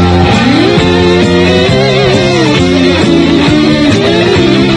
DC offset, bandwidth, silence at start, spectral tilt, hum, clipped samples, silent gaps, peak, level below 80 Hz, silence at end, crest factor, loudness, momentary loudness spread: under 0.1%; 11 kHz; 0 s; -6 dB/octave; none; 1%; none; 0 dBFS; -30 dBFS; 0 s; 6 dB; -7 LUFS; 1 LU